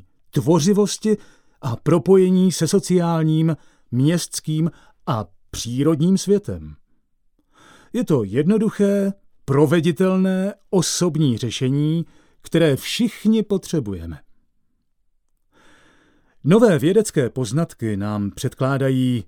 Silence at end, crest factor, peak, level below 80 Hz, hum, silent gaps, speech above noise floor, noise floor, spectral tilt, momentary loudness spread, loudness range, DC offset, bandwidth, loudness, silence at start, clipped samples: 0.05 s; 18 dB; -2 dBFS; -52 dBFS; none; none; 46 dB; -64 dBFS; -6 dB/octave; 11 LU; 5 LU; under 0.1%; 17 kHz; -19 LUFS; 0.35 s; under 0.1%